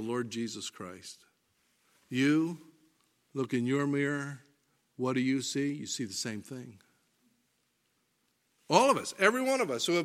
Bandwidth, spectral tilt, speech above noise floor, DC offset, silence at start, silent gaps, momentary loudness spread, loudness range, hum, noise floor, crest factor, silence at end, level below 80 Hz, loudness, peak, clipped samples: 15.5 kHz; -4.5 dB/octave; 45 dB; under 0.1%; 0 s; none; 19 LU; 5 LU; none; -76 dBFS; 26 dB; 0 s; -82 dBFS; -31 LUFS; -8 dBFS; under 0.1%